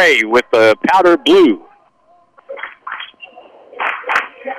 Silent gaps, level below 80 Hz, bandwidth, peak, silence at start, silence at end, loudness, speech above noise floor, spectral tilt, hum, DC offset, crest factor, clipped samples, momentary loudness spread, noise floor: none; -56 dBFS; 15 kHz; -4 dBFS; 0 s; 0 s; -12 LUFS; 42 dB; -4 dB/octave; none; under 0.1%; 10 dB; under 0.1%; 19 LU; -53 dBFS